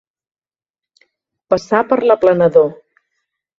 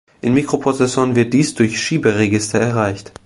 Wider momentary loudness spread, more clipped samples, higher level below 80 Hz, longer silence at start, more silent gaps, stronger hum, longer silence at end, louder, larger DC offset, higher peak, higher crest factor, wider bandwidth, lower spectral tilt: first, 8 LU vs 3 LU; neither; second, -56 dBFS vs -48 dBFS; first, 1.5 s vs 0.25 s; neither; neither; first, 0.85 s vs 0.2 s; about the same, -14 LUFS vs -16 LUFS; neither; about the same, 0 dBFS vs 0 dBFS; about the same, 16 dB vs 16 dB; second, 7.4 kHz vs 11.5 kHz; first, -7 dB/octave vs -5.5 dB/octave